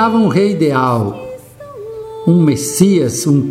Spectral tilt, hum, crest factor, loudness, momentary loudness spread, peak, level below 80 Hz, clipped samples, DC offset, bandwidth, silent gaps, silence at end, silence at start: -6 dB/octave; none; 14 dB; -13 LUFS; 19 LU; 0 dBFS; -50 dBFS; under 0.1%; under 0.1%; 16 kHz; none; 0 s; 0 s